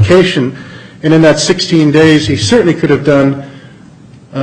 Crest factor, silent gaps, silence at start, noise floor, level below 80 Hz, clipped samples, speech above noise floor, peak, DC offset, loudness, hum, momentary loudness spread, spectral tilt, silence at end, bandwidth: 10 dB; none; 0 s; -36 dBFS; -42 dBFS; under 0.1%; 28 dB; 0 dBFS; under 0.1%; -9 LUFS; none; 14 LU; -5.5 dB/octave; 0 s; 9.8 kHz